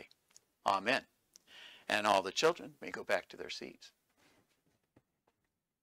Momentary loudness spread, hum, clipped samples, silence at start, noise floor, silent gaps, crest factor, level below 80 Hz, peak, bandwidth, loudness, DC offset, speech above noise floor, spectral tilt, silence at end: 17 LU; none; under 0.1%; 0 s; -86 dBFS; none; 24 dB; -80 dBFS; -14 dBFS; 16 kHz; -35 LUFS; under 0.1%; 51 dB; -2.5 dB/octave; 1.95 s